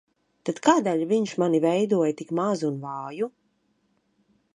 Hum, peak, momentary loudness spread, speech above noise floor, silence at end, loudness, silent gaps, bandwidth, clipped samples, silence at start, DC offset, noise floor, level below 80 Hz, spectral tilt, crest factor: none; -4 dBFS; 12 LU; 46 dB; 1.3 s; -25 LUFS; none; 11 kHz; under 0.1%; 0.45 s; under 0.1%; -70 dBFS; -74 dBFS; -6 dB/octave; 22 dB